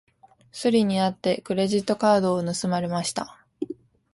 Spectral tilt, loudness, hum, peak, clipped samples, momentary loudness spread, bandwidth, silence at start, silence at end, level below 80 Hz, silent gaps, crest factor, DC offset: -5.5 dB/octave; -24 LUFS; none; -8 dBFS; under 0.1%; 15 LU; 11.5 kHz; 0.55 s; 0.4 s; -62 dBFS; none; 16 dB; under 0.1%